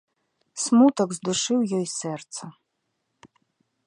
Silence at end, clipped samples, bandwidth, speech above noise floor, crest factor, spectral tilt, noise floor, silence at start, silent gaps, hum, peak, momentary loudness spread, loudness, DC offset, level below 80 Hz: 1.35 s; under 0.1%; 11 kHz; 54 dB; 18 dB; -4.5 dB/octave; -77 dBFS; 0.55 s; none; none; -6 dBFS; 19 LU; -23 LUFS; under 0.1%; -72 dBFS